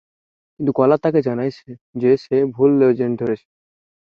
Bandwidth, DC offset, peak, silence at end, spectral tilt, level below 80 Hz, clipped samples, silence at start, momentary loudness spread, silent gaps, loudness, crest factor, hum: 6.4 kHz; under 0.1%; -2 dBFS; 0.75 s; -9.5 dB/octave; -60 dBFS; under 0.1%; 0.6 s; 10 LU; 1.81-1.93 s; -18 LUFS; 16 dB; none